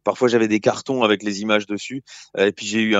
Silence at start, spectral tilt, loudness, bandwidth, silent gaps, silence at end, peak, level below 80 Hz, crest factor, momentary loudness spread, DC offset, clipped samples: 0.05 s; -4.5 dB/octave; -20 LUFS; 7.8 kHz; none; 0 s; -2 dBFS; -70 dBFS; 18 dB; 12 LU; under 0.1%; under 0.1%